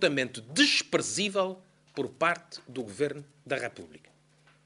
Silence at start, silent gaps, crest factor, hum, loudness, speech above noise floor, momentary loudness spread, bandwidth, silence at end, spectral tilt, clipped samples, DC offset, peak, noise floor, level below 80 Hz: 0 s; none; 22 dB; none; -29 LUFS; 33 dB; 19 LU; 11.5 kHz; 0.7 s; -2.5 dB/octave; under 0.1%; under 0.1%; -10 dBFS; -63 dBFS; -74 dBFS